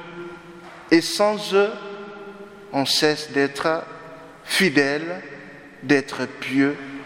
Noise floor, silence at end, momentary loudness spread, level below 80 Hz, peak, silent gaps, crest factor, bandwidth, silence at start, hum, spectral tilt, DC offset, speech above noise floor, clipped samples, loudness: -41 dBFS; 0 s; 22 LU; -64 dBFS; -2 dBFS; none; 22 dB; 16.5 kHz; 0 s; none; -4 dB/octave; under 0.1%; 21 dB; under 0.1%; -21 LUFS